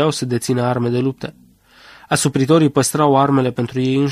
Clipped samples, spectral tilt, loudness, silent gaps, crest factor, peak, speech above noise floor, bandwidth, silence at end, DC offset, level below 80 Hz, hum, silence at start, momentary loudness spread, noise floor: under 0.1%; -5.5 dB/octave; -17 LUFS; none; 16 dB; -2 dBFS; 31 dB; 15.5 kHz; 0 s; under 0.1%; -54 dBFS; none; 0 s; 7 LU; -47 dBFS